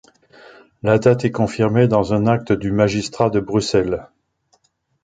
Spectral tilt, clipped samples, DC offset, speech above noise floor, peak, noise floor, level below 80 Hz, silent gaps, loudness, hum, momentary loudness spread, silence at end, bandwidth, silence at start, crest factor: -6.5 dB/octave; under 0.1%; under 0.1%; 46 dB; -2 dBFS; -63 dBFS; -46 dBFS; none; -18 LUFS; none; 5 LU; 1 s; 9.4 kHz; 0.85 s; 18 dB